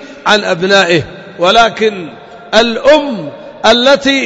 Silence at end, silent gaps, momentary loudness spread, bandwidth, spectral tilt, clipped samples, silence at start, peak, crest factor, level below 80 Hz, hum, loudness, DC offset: 0 s; none; 15 LU; 11 kHz; -3.5 dB/octave; 0.2%; 0 s; 0 dBFS; 10 dB; -42 dBFS; none; -10 LUFS; under 0.1%